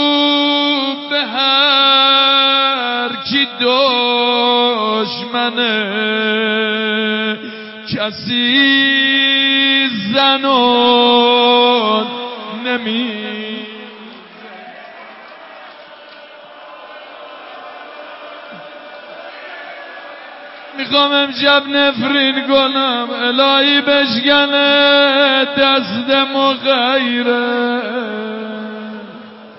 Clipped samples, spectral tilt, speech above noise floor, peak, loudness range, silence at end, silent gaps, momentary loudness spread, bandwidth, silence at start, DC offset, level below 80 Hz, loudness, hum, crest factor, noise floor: under 0.1%; -7.5 dB/octave; 23 dB; -2 dBFS; 20 LU; 0 s; none; 22 LU; 5.8 kHz; 0 s; under 0.1%; -62 dBFS; -12 LUFS; none; 14 dB; -37 dBFS